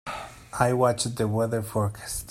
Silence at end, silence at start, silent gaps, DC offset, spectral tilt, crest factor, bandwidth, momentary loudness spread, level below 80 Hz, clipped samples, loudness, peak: 0 s; 0.05 s; none; under 0.1%; -5 dB/octave; 20 dB; 16 kHz; 14 LU; -50 dBFS; under 0.1%; -26 LUFS; -6 dBFS